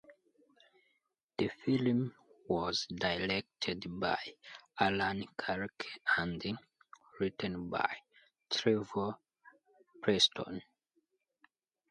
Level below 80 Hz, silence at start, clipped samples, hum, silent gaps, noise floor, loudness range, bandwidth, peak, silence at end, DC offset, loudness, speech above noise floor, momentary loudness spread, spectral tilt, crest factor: -64 dBFS; 0.1 s; under 0.1%; none; 1.23-1.27 s; -81 dBFS; 3 LU; 10 kHz; -14 dBFS; 1.3 s; under 0.1%; -35 LUFS; 46 dB; 12 LU; -4.5 dB/octave; 22 dB